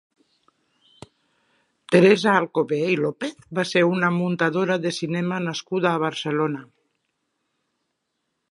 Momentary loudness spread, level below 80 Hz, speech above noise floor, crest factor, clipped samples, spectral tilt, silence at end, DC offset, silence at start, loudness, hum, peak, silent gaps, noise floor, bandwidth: 11 LU; -70 dBFS; 56 dB; 22 dB; under 0.1%; -6 dB/octave; 1.85 s; under 0.1%; 1.9 s; -22 LUFS; none; -2 dBFS; none; -77 dBFS; 11.5 kHz